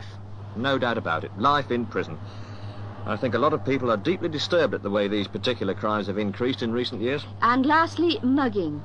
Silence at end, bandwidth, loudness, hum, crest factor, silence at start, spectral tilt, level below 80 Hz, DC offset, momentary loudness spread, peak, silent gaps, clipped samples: 0 s; 9.6 kHz; -24 LUFS; none; 16 dB; 0 s; -6.5 dB/octave; -56 dBFS; 0.4%; 15 LU; -8 dBFS; none; under 0.1%